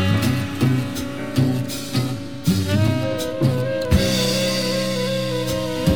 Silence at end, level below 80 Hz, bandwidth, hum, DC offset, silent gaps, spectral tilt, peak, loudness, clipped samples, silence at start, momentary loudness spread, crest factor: 0 s; -36 dBFS; over 20 kHz; none; 1%; none; -5.5 dB/octave; -4 dBFS; -21 LUFS; under 0.1%; 0 s; 6 LU; 16 dB